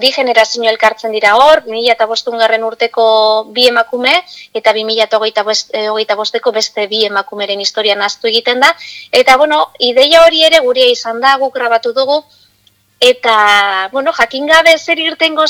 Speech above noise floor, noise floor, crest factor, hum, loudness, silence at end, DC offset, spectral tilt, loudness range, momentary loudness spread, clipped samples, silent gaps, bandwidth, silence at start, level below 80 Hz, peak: 42 dB; -53 dBFS; 10 dB; none; -10 LUFS; 0 s; under 0.1%; -1 dB/octave; 5 LU; 8 LU; 0.8%; none; 19.5 kHz; 0 s; -52 dBFS; 0 dBFS